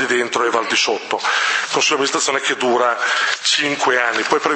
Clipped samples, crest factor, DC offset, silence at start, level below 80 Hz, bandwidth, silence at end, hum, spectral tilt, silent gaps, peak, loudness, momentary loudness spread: under 0.1%; 18 dB; under 0.1%; 0 s; -70 dBFS; 8.8 kHz; 0 s; none; -1 dB/octave; none; 0 dBFS; -16 LUFS; 2 LU